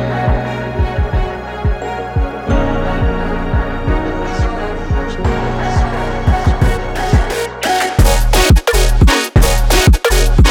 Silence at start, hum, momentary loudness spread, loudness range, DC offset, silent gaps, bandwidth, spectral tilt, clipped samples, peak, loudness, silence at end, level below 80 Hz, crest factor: 0 s; none; 8 LU; 6 LU; under 0.1%; none; 18 kHz; -5 dB/octave; under 0.1%; 0 dBFS; -15 LUFS; 0 s; -16 dBFS; 12 dB